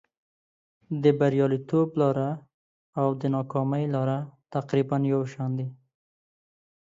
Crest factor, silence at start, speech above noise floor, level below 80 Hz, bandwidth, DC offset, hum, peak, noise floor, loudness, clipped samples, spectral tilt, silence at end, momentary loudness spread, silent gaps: 20 dB; 0.9 s; over 65 dB; -70 dBFS; 7.6 kHz; under 0.1%; none; -8 dBFS; under -90 dBFS; -26 LUFS; under 0.1%; -9 dB/octave; 1.1 s; 10 LU; 2.54-2.93 s